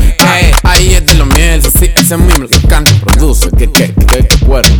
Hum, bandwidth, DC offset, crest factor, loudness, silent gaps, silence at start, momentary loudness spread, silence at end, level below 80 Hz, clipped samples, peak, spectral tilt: none; over 20 kHz; under 0.1%; 6 dB; -7 LUFS; none; 0 s; 3 LU; 0 s; -8 dBFS; 4%; 0 dBFS; -4 dB/octave